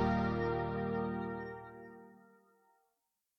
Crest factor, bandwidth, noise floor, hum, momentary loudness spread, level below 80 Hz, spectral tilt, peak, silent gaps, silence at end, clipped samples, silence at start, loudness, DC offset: 18 dB; 6.4 kHz; -85 dBFS; none; 19 LU; -54 dBFS; -9 dB/octave; -20 dBFS; none; 1.2 s; under 0.1%; 0 s; -37 LUFS; under 0.1%